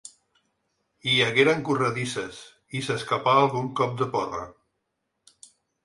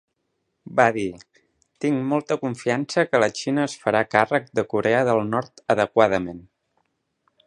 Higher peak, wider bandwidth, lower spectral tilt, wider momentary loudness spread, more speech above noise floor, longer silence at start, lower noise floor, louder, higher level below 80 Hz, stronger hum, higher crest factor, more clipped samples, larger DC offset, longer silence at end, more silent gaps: second, -6 dBFS vs 0 dBFS; about the same, 11.5 kHz vs 10.5 kHz; about the same, -4.5 dB/octave vs -5.5 dB/octave; first, 15 LU vs 8 LU; about the same, 54 dB vs 53 dB; second, 0.05 s vs 0.65 s; first, -79 dBFS vs -75 dBFS; about the same, -24 LUFS vs -22 LUFS; about the same, -62 dBFS vs -60 dBFS; neither; about the same, 22 dB vs 22 dB; neither; neither; first, 1.35 s vs 1.05 s; neither